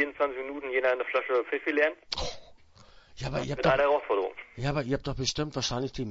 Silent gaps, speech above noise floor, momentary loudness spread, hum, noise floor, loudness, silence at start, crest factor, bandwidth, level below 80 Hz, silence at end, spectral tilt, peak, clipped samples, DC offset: none; 26 dB; 9 LU; none; -55 dBFS; -29 LUFS; 0 s; 20 dB; 8 kHz; -48 dBFS; 0 s; -4.5 dB/octave; -10 dBFS; under 0.1%; under 0.1%